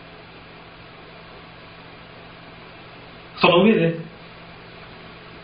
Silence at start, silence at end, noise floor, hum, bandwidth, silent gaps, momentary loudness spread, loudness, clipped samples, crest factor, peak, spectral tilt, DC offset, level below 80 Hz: 3.35 s; 0.05 s; -43 dBFS; 60 Hz at -55 dBFS; 5.2 kHz; none; 26 LU; -18 LUFS; under 0.1%; 26 dB; 0 dBFS; -4 dB/octave; under 0.1%; -56 dBFS